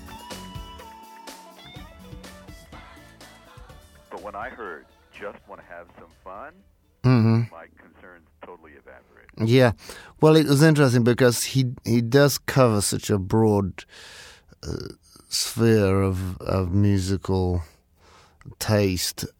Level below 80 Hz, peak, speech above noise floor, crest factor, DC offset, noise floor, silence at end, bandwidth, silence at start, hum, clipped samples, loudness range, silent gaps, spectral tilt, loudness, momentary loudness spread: -50 dBFS; -2 dBFS; 33 dB; 22 dB; under 0.1%; -55 dBFS; 0.1 s; 17.5 kHz; 0 s; none; under 0.1%; 21 LU; none; -5.5 dB/octave; -21 LUFS; 25 LU